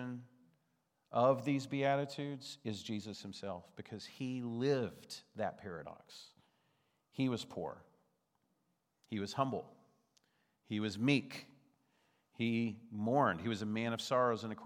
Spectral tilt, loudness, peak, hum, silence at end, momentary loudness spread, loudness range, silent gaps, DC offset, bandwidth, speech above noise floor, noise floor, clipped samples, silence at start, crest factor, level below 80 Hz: -6 dB/octave; -38 LUFS; -18 dBFS; none; 0 s; 17 LU; 8 LU; none; under 0.1%; 15.5 kHz; 45 dB; -82 dBFS; under 0.1%; 0 s; 22 dB; -82 dBFS